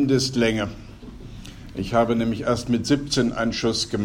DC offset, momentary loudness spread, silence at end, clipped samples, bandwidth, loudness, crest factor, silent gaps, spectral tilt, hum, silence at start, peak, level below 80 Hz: under 0.1%; 20 LU; 0 s; under 0.1%; 16 kHz; -23 LUFS; 16 dB; none; -5 dB/octave; none; 0 s; -6 dBFS; -42 dBFS